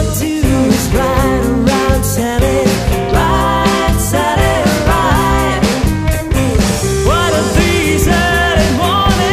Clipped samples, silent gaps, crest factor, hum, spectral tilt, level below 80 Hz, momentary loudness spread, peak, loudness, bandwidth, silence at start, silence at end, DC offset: under 0.1%; none; 12 dB; none; -5 dB/octave; -20 dBFS; 3 LU; 0 dBFS; -12 LUFS; 15.5 kHz; 0 s; 0 s; under 0.1%